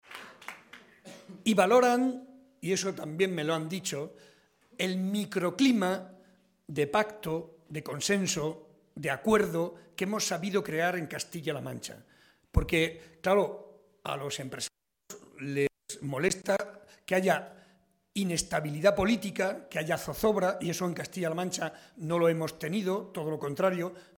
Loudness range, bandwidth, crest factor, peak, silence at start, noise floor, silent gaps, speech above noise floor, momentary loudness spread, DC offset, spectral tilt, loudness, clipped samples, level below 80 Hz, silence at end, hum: 4 LU; 17 kHz; 22 dB; -10 dBFS; 0.1 s; -66 dBFS; none; 37 dB; 17 LU; under 0.1%; -4.5 dB/octave; -30 LUFS; under 0.1%; -50 dBFS; 0.15 s; none